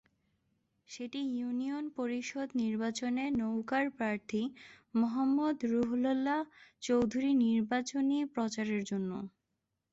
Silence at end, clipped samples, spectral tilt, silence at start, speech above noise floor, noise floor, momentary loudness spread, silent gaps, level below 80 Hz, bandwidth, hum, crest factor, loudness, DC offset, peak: 0.65 s; under 0.1%; -5 dB/octave; 0.9 s; 52 dB; -85 dBFS; 9 LU; none; -70 dBFS; 8 kHz; none; 14 dB; -34 LUFS; under 0.1%; -20 dBFS